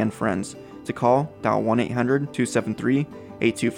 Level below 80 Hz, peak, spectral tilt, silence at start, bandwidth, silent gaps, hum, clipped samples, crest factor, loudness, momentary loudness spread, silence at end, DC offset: -60 dBFS; -6 dBFS; -6 dB/octave; 0 s; 16 kHz; none; none; under 0.1%; 18 dB; -24 LUFS; 11 LU; 0 s; under 0.1%